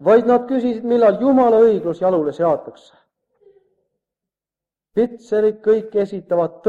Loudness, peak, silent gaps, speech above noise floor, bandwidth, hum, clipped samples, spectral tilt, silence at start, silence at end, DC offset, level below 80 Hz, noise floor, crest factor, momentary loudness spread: -17 LUFS; -2 dBFS; none; 73 dB; 7.4 kHz; none; under 0.1%; -8 dB/octave; 0 s; 0 s; under 0.1%; -60 dBFS; -89 dBFS; 16 dB; 8 LU